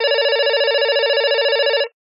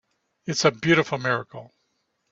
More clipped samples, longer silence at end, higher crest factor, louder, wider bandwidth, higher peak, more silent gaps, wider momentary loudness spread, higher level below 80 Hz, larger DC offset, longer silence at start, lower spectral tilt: neither; second, 0.25 s vs 0.65 s; second, 10 dB vs 22 dB; first, -16 LUFS vs -23 LUFS; second, 5.6 kHz vs 7.8 kHz; about the same, -6 dBFS vs -4 dBFS; neither; second, 1 LU vs 20 LU; second, under -90 dBFS vs -64 dBFS; neither; second, 0 s vs 0.45 s; second, -1.5 dB/octave vs -4.5 dB/octave